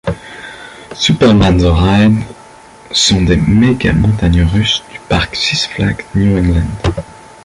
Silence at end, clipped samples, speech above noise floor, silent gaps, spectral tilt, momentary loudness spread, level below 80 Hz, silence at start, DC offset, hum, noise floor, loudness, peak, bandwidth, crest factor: 0.3 s; under 0.1%; 26 dB; none; -5.5 dB/octave; 17 LU; -22 dBFS; 0.05 s; under 0.1%; none; -37 dBFS; -12 LUFS; 0 dBFS; 11.5 kHz; 12 dB